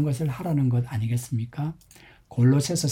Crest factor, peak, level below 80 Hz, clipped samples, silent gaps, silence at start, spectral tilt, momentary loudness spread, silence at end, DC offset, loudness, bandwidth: 14 dB; -10 dBFS; -56 dBFS; under 0.1%; none; 0 s; -6.5 dB/octave; 12 LU; 0 s; under 0.1%; -25 LUFS; 16 kHz